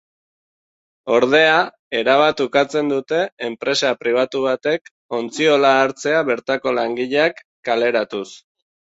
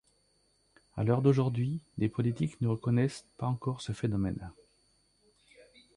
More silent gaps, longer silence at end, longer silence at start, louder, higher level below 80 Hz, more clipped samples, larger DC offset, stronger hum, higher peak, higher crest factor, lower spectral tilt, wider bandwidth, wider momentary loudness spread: first, 1.79-1.91 s, 3.32-3.37 s, 4.81-4.85 s, 4.91-5.09 s, 7.45-7.63 s vs none; second, 0.55 s vs 1.45 s; about the same, 1.05 s vs 0.95 s; first, -18 LUFS vs -32 LUFS; second, -64 dBFS vs -58 dBFS; neither; neither; second, none vs 50 Hz at -55 dBFS; first, 0 dBFS vs -12 dBFS; about the same, 18 dB vs 20 dB; second, -4 dB/octave vs -8 dB/octave; second, 8 kHz vs 11 kHz; about the same, 11 LU vs 9 LU